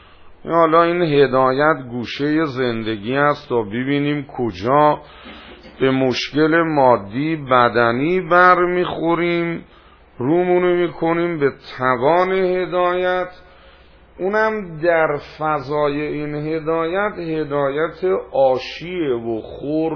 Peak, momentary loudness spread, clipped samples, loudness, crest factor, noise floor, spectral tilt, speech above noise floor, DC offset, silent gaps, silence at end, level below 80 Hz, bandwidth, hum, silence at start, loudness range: 0 dBFS; 10 LU; under 0.1%; -18 LUFS; 18 dB; -46 dBFS; -7 dB/octave; 29 dB; under 0.1%; none; 0 s; -50 dBFS; 5.4 kHz; none; 0.25 s; 5 LU